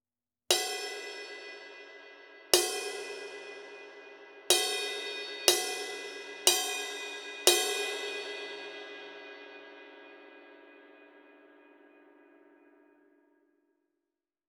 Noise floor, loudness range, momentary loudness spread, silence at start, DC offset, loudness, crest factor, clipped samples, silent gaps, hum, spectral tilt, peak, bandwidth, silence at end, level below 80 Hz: under -90 dBFS; 18 LU; 24 LU; 0.5 s; under 0.1%; -30 LUFS; 34 dB; under 0.1%; none; none; 1 dB/octave; -2 dBFS; over 20 kHz; 3 s; -82 dBFS